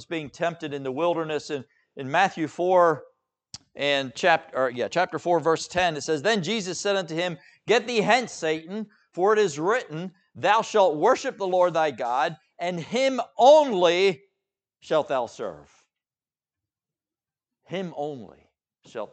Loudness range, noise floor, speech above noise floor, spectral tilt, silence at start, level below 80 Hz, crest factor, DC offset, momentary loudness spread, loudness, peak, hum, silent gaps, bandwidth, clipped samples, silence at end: 11 LU; under -90 dBFS; over 66 dB; -4 dB/octave; 0 s; -68 dBFS; 20 dB; under 0.1%; 16 LU; -24 LUFS; -4 dBFS; none; none; 9 kHz; under 0.1%; 0.05 s